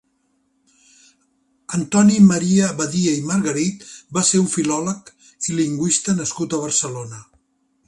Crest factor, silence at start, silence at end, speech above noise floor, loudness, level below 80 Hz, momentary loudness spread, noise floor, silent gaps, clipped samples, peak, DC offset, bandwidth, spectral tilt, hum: 18 dB; 1.7 s; 0.65 s; 48 dB; -18 LUFS; -58 dBFS; 15 LU; -66 dBFS; none; under 0.1%; -2 dBFS; under 0.1%; 11.5 kHz; -4.5 dB/octave; none